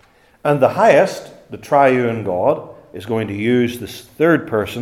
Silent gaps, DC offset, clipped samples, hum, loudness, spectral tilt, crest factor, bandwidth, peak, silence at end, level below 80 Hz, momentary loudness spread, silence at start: none; under 0.1%; under 0.1%; none; -16 LUFS; -6.5 dB/octave; 16 dB; 15.5 kHz; 0 dBFS; 0 s; -56 dBFS; 20 LU; 0.45 s